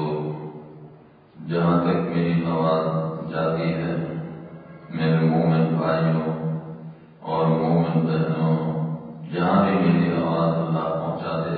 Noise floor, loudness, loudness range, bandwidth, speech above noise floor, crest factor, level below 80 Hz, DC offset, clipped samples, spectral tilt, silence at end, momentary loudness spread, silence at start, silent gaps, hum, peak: -49 dBFS; -23 LUFS; 3 LU; 4.7 kHz; 28 dB; 16 dB; -54 dBFS; under 0.1%; under 0.1%; -12.5 dB/octave; 0 s; 17 LU; 0 s; none; none; -6 dBFS